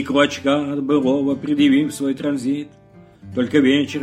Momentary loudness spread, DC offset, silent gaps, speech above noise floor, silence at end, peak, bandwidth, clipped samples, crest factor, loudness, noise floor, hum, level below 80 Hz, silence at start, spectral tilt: 9 LU; under 0.1%; none; 25 dB; 0 s; -2 dBFS; 12.5 kHz; under 0.1%; 16 dB; -19 LUFS; -43 dBFS; none; -58 dBFS; 0 s; -5.5 dB/octave